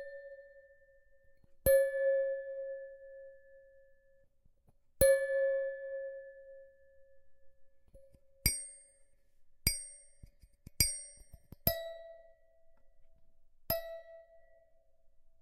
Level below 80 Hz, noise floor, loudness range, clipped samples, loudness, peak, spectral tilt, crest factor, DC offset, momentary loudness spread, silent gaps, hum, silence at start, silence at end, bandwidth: -54 dBFS; -67 dBFS; 7 LU; under 0.1%; -33 LUFS; -8 dBFS; -2.5 dB/octave; 30 dB; under 0.1%; 26 LU; none; none; 0 s; 0.2 s; 15 kHz